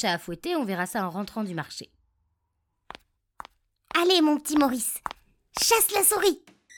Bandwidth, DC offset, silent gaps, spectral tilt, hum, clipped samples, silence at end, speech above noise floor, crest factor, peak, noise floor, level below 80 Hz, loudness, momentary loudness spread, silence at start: 19 kHz; under 0.1%; none; -2.5 dB/octave; none; under 0.1%; 0.4 s; 52 dB; 22 dB; -6 dBFS; -77 dBFS; -60 dBFS; -24 LUFS; 16 LU; 0 s